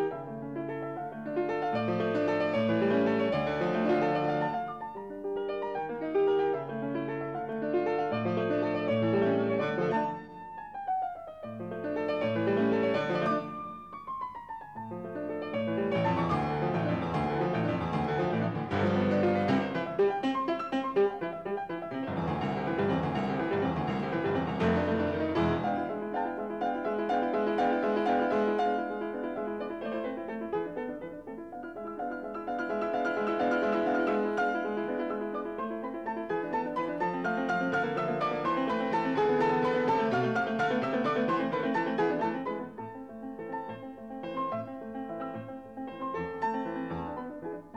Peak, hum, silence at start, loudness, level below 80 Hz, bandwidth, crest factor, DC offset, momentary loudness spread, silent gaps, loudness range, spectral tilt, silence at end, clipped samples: -16 dBFS; none; 0 s; -31 LUFS; -60 dBFS; 8.8 kHz; 14 dB; under 0.1%; 12 LU; none; 6 LU; -7.5 dB/octave; 0 s; under 0.1%